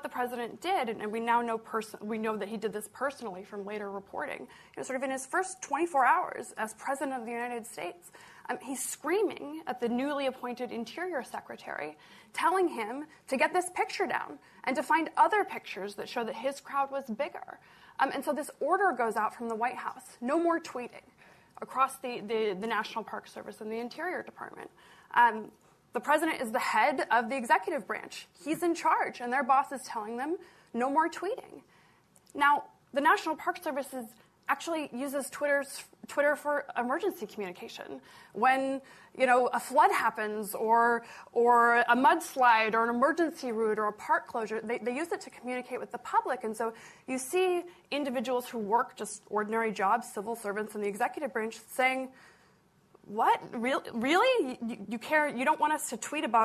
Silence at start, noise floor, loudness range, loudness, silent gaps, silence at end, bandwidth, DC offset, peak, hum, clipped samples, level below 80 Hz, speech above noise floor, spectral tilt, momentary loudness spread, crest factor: 0 s; -65 dBFS; 8 LU; -31 LUFS; none; 0 s; 14 kHz; under 0.1%; -12 dBFS; none; under 0.1%; -78 dBFS; 34 dB; -3.5 dB/octave; 15 LU; 18 dB